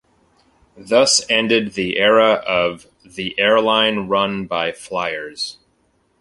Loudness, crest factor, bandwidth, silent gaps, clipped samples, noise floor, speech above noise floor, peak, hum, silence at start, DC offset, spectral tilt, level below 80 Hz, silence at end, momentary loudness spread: -17 LUFS; 18 dB; 11.5 kHz; none; under 0.1%; -62 dBFS; 45 dB; 0 dBFS; none; 0.75 s; under 0.1%; -2.5 dB/octave; -56 dBFS; 0.7 s; 13 LU